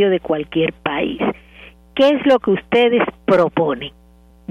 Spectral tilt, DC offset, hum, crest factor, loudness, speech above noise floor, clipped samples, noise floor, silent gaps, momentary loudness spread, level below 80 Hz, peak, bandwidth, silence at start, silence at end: -7 dB/octave; under 0.1%; none; 14 dB; -17 LUFS; 27 dB; under 0.1%; -43 dBFS; none; 13 LU; -48 dBFS; -2 dBFS; 8.8 kHz; 0 s; 0.6 s